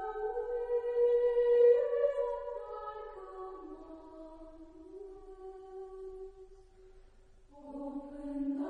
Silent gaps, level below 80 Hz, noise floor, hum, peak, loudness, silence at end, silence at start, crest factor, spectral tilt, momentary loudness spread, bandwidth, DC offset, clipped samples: none; -60 dBFS; -59 dBFS; none; -16 dBFS; -32 LUFS; 0 s; 0 s; 18 dB; -7 dB/octave; 24 LU; 4.5 kHz; under 0.1%; under 0.1%